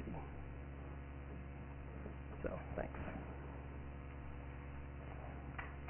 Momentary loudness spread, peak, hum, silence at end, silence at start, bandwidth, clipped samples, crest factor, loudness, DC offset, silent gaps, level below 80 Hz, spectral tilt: 5 LU; -28 dBFS; 60 Hz at -60 dBFS; 0 s; 0 s; 3.2 kHz; under 0.1%; 20 dB; -50 LUFS; under 0.1%; none; -52 dBFS; -5 dB/octave